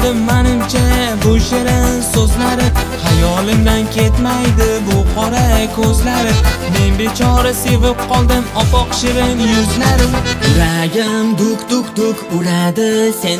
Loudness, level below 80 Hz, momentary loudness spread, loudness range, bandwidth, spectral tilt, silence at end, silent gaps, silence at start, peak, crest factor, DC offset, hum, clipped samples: -13 LUFS; -18 dBFS; 2 LU; 1 LU; 16 kHz; -5 dB/octave; 0 s; none; 0 s; 0 dBFS; 12 dB; under 0.1%; none; under 0.1%